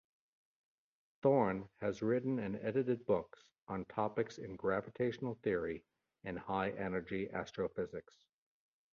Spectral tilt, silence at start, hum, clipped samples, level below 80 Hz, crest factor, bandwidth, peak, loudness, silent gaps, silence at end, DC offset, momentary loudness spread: -6.5 dB/octave; 1.25 s; none; under 0.1%; -68 dBFS; 20 dB; 7.2 kHz; -20 dBFS; -38 LUFS; 3.62-3.67 s; 0.9 s; under 0.1%; 11 LU